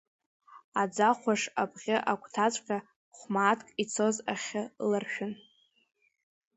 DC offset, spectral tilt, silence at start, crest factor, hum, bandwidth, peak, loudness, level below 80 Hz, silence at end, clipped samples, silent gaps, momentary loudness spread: under 0.1%; -3.5 dB/octave; 0.5 s; 22 dB; none; 8.2 kHz; -10 dBFS; -31 LUFS; -78 dBFS; 1.2 s; under 0.1%; 0.64-0.72 s, 2.96-3.12 s; 10 LU